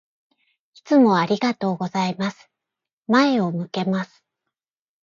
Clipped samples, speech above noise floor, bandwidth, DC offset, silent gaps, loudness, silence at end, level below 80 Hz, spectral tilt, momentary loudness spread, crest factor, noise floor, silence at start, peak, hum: under 0.1%; 66 dB; 7.4 kHz; under 0.1%; 2.93-3.01 s; -21 LUFS; 1 s; -70 dBFS; -6.5 dB/octave; 11 LU; 18 dB; -86 dBFS; 0.85 s; -4 dBFS; none